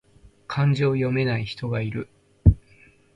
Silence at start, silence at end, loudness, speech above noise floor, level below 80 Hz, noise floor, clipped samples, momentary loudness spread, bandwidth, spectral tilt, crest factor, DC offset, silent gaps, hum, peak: 0.5 s; 0.6 s; -24 LUFS; 32 dB; -32 dBFS; -55 dBFS; under 0.1%; 13 LU; 8 kHz; -8.5 dB/octave; 22 dB; under 0.1%; none; none; -2 dBFS